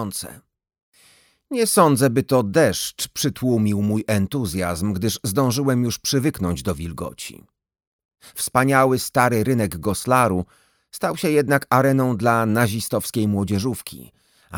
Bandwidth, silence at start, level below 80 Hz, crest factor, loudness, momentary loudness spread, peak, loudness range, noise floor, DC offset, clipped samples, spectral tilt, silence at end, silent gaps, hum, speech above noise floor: over 20 kHz; 0 s; -48 dBFS; 20 dB; -20 LUFS; 12 LU; -2 dBFS; 3 LU; -56 dBFS; under 0.1%; under 0.1%; -5 dB/octave; 0 s; 0.82-0.92 s, 7.87-7.99 s, 8.05-8.09 s; none; 36 dB